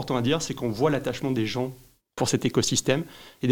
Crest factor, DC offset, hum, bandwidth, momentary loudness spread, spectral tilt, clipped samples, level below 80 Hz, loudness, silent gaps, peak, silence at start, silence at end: 18 dB; under 0.1%; none; 18 kHz; 8 LU; -4.5 dB/octave; under 0.1%; -56 dBFS; -26 LUFS; none; -6 dBFS; 0 s; 0 s